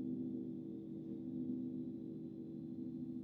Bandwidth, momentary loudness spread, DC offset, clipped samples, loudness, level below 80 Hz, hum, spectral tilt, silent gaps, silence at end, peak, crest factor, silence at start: 4.2 kHz; 5 LU; under 0.1%; under 0.1%; -46 LUFS; -78 dBFS; none; -12 dB/octave; none; 0 s; -32 dBFS; 12 dB; 0 s